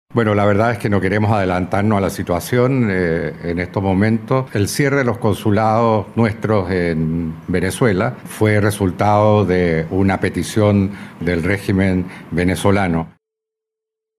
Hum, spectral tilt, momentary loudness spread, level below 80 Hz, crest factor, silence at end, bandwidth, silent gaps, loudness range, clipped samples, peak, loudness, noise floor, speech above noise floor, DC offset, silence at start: none; -7 dB/octave; 7 LU; -42 dBFS; 16 dB; 1.1 s; 15 kHz; none; 2 LU; under 0.1%; 0 dBFS; -17 LUFS; -83 dBFS; 67 dB; under 0.1%; 0.15 s